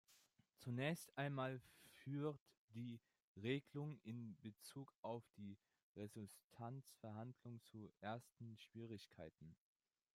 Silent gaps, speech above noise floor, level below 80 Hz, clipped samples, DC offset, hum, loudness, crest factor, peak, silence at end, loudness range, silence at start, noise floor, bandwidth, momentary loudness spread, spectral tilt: 2.41-2.46 s, 2.57-2.68 s, 3.22-3.35 s, 4.96-5.03 s, 5.83-5.95 s, 6.44-6.50 s; 25 dB; -88 dBFS; under 0.1%; under 0.1%; none; -52 LUFS; 22 dB; -30 dBFS; 0.6 s; 7 LU; 0.1 s; -77 dBFS; 16 kHz; 15 LU; -6 dB/octave